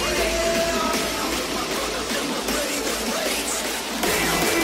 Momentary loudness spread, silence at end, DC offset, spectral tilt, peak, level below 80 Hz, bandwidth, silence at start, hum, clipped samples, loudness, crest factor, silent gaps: 4 LU; 0 s; under 0.1%; -2 dB/octave; -10 dBFS; -40 dBFS; 16.5 kHz; 0 s; none; under 0.1%; -23 LUFS; 14 dB; none